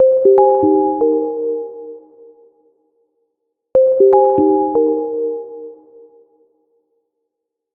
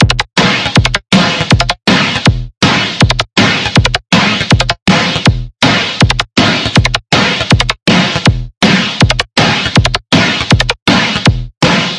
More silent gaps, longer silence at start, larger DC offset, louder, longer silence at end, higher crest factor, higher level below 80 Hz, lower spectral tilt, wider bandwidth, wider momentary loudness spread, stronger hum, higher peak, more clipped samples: second, none vs 2.57-2.61 s, 4.82-4.86 s, 8.57-8.61 s, 10.82-10.86 s, 11.57-11.61 s; about the same, 0 s vs 0 s; neither; second, -14 LUFS vs -10 LUFS; first, 2 s vs 0 s; first, 16 dB vs 10 dB; second, -58 dBFS vs -24 dBFS; first, -12 dB/octave vs -4.5 dB/octave; second, 2.1 kHz vs 12 kHz; first, 21 LU vs 2 LU; neither; about the same, 0 dBFS vs 0 dBFS; second, under 0.1% vs 0.3%